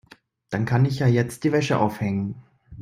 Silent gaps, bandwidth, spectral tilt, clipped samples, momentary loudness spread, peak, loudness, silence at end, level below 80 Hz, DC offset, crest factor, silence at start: none; 15 kHz; -7 dB/octave; under 0.1%; 11 LU; -6 dBFS; -23 LUFS; 0 s; -54 dBFS; under 0.1%; 18 dB; 0.5 s